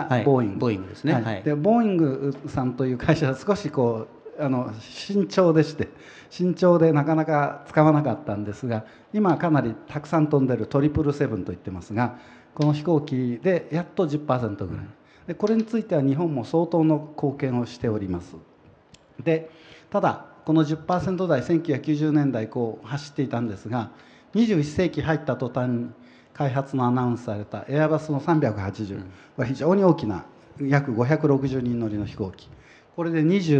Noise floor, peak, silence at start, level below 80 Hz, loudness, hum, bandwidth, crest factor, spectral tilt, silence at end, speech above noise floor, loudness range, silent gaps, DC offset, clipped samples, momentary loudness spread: -54 dBFS; -2 dBFS; 0 s; -54 dBFS; -24 LUFS; none; 8.4 kHz; 20 dB; -8 dB/octave; 0 s; 31 dB; 4 LU; none; under 0.1%; under 0.1%; 12 LU